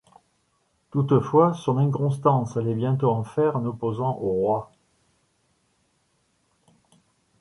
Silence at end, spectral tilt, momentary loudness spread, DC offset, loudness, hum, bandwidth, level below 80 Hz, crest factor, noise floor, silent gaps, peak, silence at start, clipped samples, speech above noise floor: 2.75 s; -9 dB/octave; 7 LU; under 0.1%; -23 LUFS; none; 11 kHz; -60 dBFS; 20 dB; -69 dBFS; none; -6 dBFS; 0.95 s; under 0.1%; 47 dB